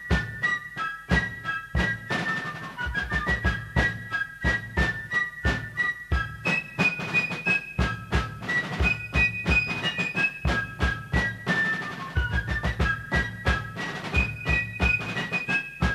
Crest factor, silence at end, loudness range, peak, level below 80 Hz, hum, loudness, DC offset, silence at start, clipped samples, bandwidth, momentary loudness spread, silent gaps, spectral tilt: 18 dB; 0 s; 2 LU; -8 dBFS; -34 dBFS; none; -26 LUFS; under 0.1%; 0 s; under 0.1%; 13.5 kHz; 6 LU; none; -5 dB/octave